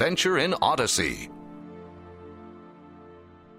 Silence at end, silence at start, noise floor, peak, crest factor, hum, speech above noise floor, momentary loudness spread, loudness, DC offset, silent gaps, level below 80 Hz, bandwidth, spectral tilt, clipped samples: 0.35 s; 0 s; -50 dBFS; -8 dBFS; 20 dB; none; 25 dB; 23 LU; -24 LUFS; under 0.1%; none; -54 dBFS; 16 kHz; -3 dB/octave; under 0.1%